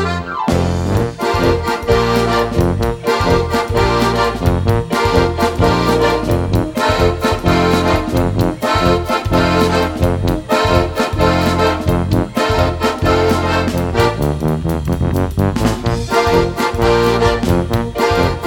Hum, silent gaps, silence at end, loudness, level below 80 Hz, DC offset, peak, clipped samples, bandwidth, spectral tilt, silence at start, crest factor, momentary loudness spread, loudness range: none; none; 0 s; -15 LUFS; -26 dBFS; under 0.1%; 0 dBFS; under 0.1%; 18 kHz; -6 dB/octave; 0 s; 14 dB; 4 LU; 1 LU